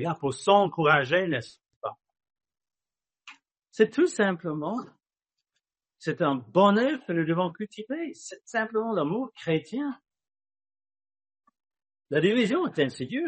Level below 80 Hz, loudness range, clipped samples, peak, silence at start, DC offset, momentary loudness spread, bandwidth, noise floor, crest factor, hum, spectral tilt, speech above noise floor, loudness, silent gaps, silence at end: -72 dBFS; 5 LU; under 0.1%; -6 dBFS; 0 s; under 0.1%; 16 LU; 8.4 kHz; under -90 dBFS; 22 dB; none; -6 dB/octave; over 64 dB; -26 LUFS; 1.76-1.81 s; 0 s